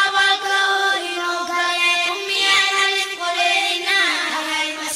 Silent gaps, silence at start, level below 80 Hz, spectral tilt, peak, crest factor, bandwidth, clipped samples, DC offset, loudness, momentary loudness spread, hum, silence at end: none; 0 s; -62 dBFS; 1 dB/octave; -6 dBFS; 14 dB; 16 kHz; under 0.1%; under 0.1%; -17 LUFS; 7 LU; none; 0 s